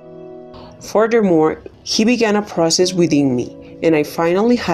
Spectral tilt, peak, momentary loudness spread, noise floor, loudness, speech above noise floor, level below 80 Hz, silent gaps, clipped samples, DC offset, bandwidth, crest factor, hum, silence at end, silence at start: -4.5 dB/octave; -2 dBFS; 19 LU; -36 dBFS; -16 LUFS; 21 dB; -52 dBFS; none; under 0.1%; under 0.1%; 14 kHz; 14 dB; none; 0 s; 0.05 s